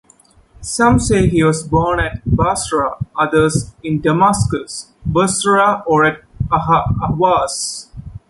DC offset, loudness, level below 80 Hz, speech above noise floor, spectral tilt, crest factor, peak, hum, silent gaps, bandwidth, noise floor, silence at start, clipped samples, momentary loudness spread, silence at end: under 0.1%; -15 LUFS; -32 dBFS; 35 dB; -5 dB/octave; 14 dB; -2 dBFS; none; none; 11.5 kHz; -50 dBFS; 0.6 s; under 0.1%; 10 LU; 0.1 s